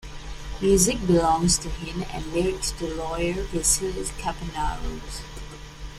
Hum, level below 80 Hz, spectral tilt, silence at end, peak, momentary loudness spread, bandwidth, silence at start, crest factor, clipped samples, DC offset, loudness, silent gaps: none; -36 dBFS; -4 dB/octave; 0 s; -6 dBFS; 19 LU; 15.5 kHz; 0 s; 20 dB; under 0.1%; under 0.1%; -24 LUFS; none